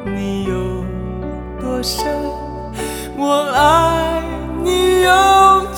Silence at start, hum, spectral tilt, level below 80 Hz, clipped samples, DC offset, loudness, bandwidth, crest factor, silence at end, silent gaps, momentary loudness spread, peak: 0 s; none; -4.5 dB/octave; -32 dBFS; under 0.1%; under 0.1%; -16 LUFS; 20 kHz; 16 dB; 0 s; none; 15 LU; 0 dBFS